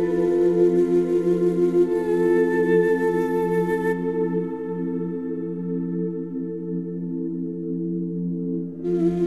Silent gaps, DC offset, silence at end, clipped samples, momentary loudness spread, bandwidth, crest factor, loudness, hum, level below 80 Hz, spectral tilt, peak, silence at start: none; 0.3%; 0 s; under 0.1%; 10 LU; 12.5 kHz; 14 dB; -23 LUFS; none; -56 dBFS; -9 dB/octave; -8 dBFS; 0 s